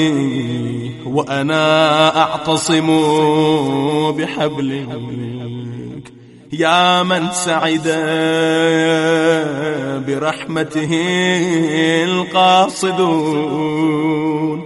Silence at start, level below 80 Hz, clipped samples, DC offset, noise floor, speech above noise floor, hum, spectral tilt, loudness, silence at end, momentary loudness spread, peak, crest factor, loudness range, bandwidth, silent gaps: 0 s; -56 dBFS; under 0.1%; under 0.1%; -40 dBFS; 24 dB; none; -4.5 dB/octave; -15 LUFS; 0 s; 12 LU; 0 dBFS; 16 dB; 4 LU; 11.5 kHz; none